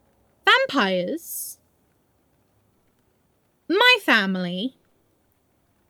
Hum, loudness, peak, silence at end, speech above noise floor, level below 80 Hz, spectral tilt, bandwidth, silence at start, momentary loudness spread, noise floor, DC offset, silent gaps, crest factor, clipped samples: none; -20 LUFS; -2 dBFS; 1.2 s; 45 dB; -76 dBFS; -3.5 dB/octave; over 20 kHz; 0.45 s; 16 LU; -66 dBFS; under 0.1%; none; 24 dB; under 0.1%